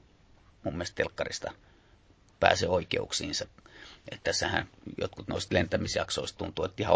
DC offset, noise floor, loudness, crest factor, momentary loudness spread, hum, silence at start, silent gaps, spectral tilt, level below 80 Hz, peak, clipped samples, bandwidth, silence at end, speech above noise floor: under 0.1%; -61 dBFS; -31 LUFS; 28 dB; 15 LU; none; 0.65 s; none; -3.5 dB/octave; -50 dBFS; -4 dBFS; under 0.1%; 8 kHz; 0 s; 30 dB